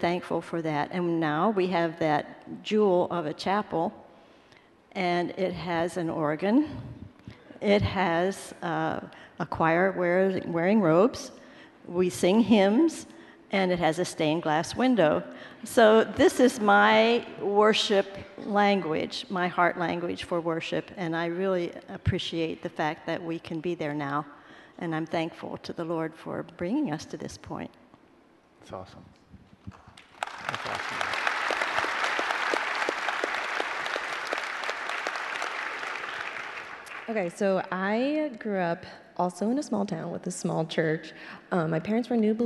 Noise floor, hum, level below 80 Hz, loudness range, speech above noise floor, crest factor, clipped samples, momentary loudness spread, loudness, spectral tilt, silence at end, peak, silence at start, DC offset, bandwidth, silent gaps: -59 dBFS; none; -60 dBFS; 10 LU; 33 dB; 20 dB; under 0.1%; 15 LU; -27 LUFS; -5.5 dB/octave; 0 s; -8 dBFS; 0 s; under 0.1%; 12 kHz; none